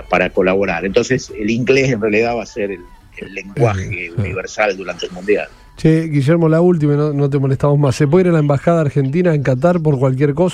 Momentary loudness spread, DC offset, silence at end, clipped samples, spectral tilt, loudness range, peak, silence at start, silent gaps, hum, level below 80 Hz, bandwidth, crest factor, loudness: 11 LU; under 0.1%; 0 s; under 0.1%; -7 dB/octave; 6 LU; -2 dBFS; 0 s; none; none; -42 dBFS; 10.5 kHz; 14 dB; -15 LUFS